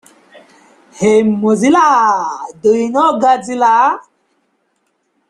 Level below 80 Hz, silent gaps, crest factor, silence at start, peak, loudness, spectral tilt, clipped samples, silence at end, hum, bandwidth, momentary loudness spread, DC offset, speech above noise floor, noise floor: -58 dBFS; none; 12 dB; 0.95 s; 0 dBFS; -12 LUFS; -5 dB/octave; under 0.1%; 1.3 s; none; 11.5 kHz; 7 LU; under 0.1%; 52 dB; -64 dBFS